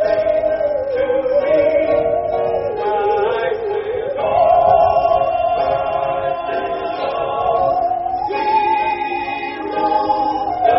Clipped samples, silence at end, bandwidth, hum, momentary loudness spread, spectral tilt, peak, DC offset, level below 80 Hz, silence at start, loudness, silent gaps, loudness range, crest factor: under 0.1%; 0 s; 5.8 kHz; none; 8 LU; -3.5 dB/octave; -2 dBFS; under 0.1%; -46 dBFS; 0 s; -17 LUFS; none; 3 LU; 14 dB